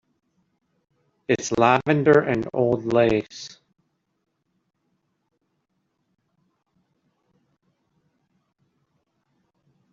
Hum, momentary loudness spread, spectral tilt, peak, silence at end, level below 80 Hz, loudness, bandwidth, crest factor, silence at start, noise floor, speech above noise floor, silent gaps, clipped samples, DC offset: none; 20 LU; -6 dB/octave; -4 dBFS; 6.4 s; -58 dBFS; -20 LUFS; 7.6 kHz; 24 dB; 1.3 s; -74 dBFS; 54 dB; none; under 0.1%; under 0.1%